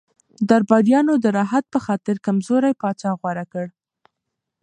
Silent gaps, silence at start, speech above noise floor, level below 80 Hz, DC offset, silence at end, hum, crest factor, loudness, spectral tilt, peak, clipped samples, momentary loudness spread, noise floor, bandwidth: none; 0.4 s; 62 dB; -66 dBFS; under 0.1%; 0.95 s; none; 18 dB; -19 LUFS; -7 dB/octave; -2 dBFS; under 0.1%; 12 LU; -81 dBFS; 10.5 kHz